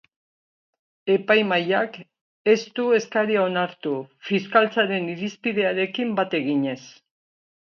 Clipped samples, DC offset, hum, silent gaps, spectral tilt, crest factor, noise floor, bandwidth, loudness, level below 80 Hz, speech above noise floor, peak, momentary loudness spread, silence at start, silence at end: under 0.1%; under 0.1%; none; 2.21-2.45 s; -5.5 dB/octave; 20 dB; under -90 dBFS; 7 kHz; -22 LUFS; -74 dBFS; over 68 dB; -4 dBFS; 10 LU; 1.05 s; 0.8 s